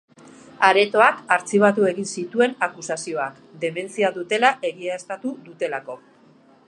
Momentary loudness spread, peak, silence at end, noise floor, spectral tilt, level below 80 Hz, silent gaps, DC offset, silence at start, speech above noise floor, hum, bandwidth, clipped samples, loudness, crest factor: 14 LU; 0 dBFS; 0.7 s; -53 dBFS; -4 dB/octave; -76 dBFS; none; under 0.1%; 0.6 s; 32 dB; none; 11.5 kHz; under 0.1%; -21 LUFS; 22 dB